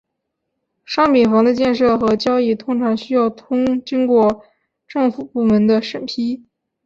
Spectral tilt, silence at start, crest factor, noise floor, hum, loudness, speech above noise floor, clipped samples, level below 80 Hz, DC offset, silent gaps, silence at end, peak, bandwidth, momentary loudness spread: -6.5 dB/octave; 0.9 s; 14 dB; -76 dBFS; none; -17 LUFS; 60 dB; under 0.1%; -52 dBFS; under 0.1%; none; 0.5 s; -4 dBFS; 7.4 kHz; 10 LU